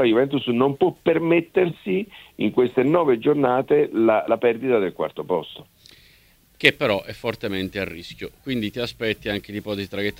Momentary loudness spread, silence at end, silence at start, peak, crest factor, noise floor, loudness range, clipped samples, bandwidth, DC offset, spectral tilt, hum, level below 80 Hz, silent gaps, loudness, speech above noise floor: 11 LU; 0.05 s; 0 s; 0 dBFS; 22 dB; -56 dBFS; 5 LU; under 0.1%; 16 kHz; under 0.1%; -6.5 dB/octave; none; -56 dBFS; none; -22 LUFS; 34 dB